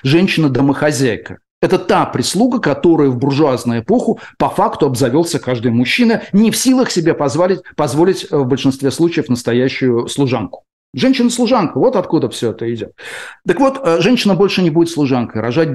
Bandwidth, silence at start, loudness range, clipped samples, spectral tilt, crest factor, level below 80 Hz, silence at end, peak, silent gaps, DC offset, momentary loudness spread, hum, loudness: 12.5 kHz; 0.05 s; 2 LU; under 0.1%; -5.5 dB/octave; 10 dB; -48 dBFS; 0 s; -4 dBFS; 1.51-1.62 s, 10.73-10.93 s; under 0.1%; 7 LU; none; -14 LUFS